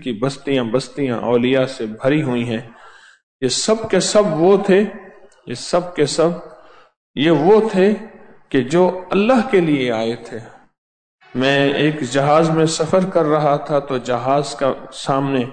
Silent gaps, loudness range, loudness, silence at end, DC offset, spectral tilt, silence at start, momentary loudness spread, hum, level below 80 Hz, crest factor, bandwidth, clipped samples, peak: 3.23-3.40 s, 6.97-7.14 s, 10.78-11.18 s; 2 LU; -17 LUFS; 0 s; under 0.1%; -5 dB/octave; 0 s; 10 LU; none; -52 dBFS; 14 dB; 9.4 kHz; under 0.1%; -4 dBFS